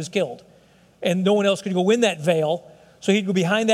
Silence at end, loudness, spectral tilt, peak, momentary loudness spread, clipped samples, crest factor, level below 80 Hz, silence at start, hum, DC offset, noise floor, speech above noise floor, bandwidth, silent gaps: 0 s; -21 LUFS; -5 dB/octave; -6 dBFS; 10 LU; under 0.1%; 16 dB; -70 dBFS; 0 s; none; under 0.1%; -54 dBFS; 34 dB; 13.5 kHz; none